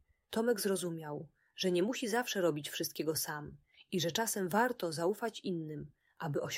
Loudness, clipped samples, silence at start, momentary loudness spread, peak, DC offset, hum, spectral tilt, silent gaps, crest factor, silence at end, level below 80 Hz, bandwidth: -35 LUFS; under 0.1%; 0.3 s; 13 LU; -18 dBFS; under 0.1%; none; -4 dB/octave; none; 18 dB; 0 s; -74 dBFS; 16 kHz